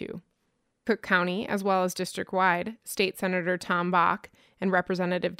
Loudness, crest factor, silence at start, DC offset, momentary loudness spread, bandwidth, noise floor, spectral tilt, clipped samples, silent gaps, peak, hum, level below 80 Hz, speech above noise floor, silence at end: -27 LUFS; 20 dB; 0 s; under 0.1%; 9 LU; 16 kHz; -75 dBFS; -5 dB/octave; under 0.1%; none; -8 dBFS; none; -68 dBFS; 48 dB; 0.05 s